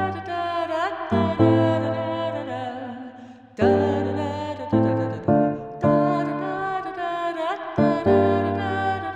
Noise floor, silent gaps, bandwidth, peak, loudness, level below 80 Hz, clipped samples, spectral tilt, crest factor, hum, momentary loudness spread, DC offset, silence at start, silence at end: -43 dBFS; none; 9 kHz; -4 dBFS; -23 LUFS; -56 dBFS; under 0.1%; -8 dB/octave; 18 dB; none; 11 LU; under 0.1%; 0 s; 0 s